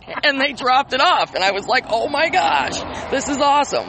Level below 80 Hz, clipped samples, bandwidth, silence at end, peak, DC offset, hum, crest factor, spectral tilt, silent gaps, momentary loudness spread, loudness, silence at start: -48 dBFS; under 0.1%; 8.8 kHz; 0 s; -2 dBFS; under 0.1%; none; 16 dB; -2.5 dB/octave; none; 7 LU; -17 LUFS; 0.05 s